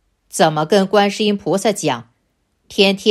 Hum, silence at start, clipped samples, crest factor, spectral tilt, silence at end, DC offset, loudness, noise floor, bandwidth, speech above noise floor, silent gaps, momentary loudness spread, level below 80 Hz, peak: none; 0.35 s; under 0.1%; 16 dB; -4.5 dB/octave; 0 s; under 0.1%; -16 LUFS; -66 dBFS; 15 kHz; 50 dB; none; 11 LU; -60 dBFS; 0 dBFS